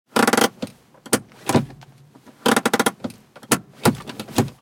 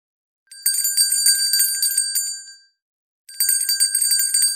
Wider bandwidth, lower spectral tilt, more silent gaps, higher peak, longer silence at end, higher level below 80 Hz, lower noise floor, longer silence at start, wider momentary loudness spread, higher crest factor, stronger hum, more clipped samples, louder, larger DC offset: about the same, 17 kHz vs 17 kHz; first, -4 dB/octave vs 9 dB/octave; second, none vs 2.82-3.25 s; about the same, -2 dBFS vs -2 dBFS; about the same, 0.1 s vs 0 s; first, -58 dBFS vs -88 dBFS; first, -49 dBFS vs -39 dBFS; second, 0.15 s vs 0.5 s; first, 17 LU vs 8 LU; about the same, 20 dB vs 20 dB; neither; neither; second, -21 LUFS vs -16 LUFS; neither